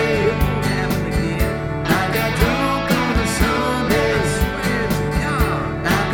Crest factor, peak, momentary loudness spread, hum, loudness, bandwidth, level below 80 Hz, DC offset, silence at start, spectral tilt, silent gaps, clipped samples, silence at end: 16 dB; -2 dBFS; 3 LU; none; -19 LUFS; 18.5 kHz; -28 dBFS; under 0.1%; 0 s; -5.5 dB/octave; none; under 0.1%; 0 s